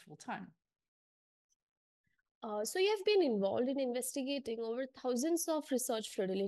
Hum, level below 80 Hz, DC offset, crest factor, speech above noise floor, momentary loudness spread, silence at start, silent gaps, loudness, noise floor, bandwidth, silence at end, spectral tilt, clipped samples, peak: none; -84 dBFS; under 0.1%; 16 dB; over 54 dB; 14 LU; 0.05 s; 0.88-1.49 s, 1.56-2.04 s, 2.31-2.41 s; -36 LUFS; under -90 dBFS; 12.5 kHz; 0 s; -3.5 dB/octave; under 0.1%; -22 dBFS